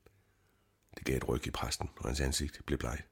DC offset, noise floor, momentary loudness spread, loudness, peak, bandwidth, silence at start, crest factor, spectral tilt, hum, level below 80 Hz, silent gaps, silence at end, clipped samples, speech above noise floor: under 0.1%; -72 dBFS; 5 LU; -36 LUFS; -18 dBFS; 18.5 kHz; 0.95 s; 20 dB; -4.5 dB/octave; none; -44 dBFS; none; 0.1 s; under 0.1%; 36 dB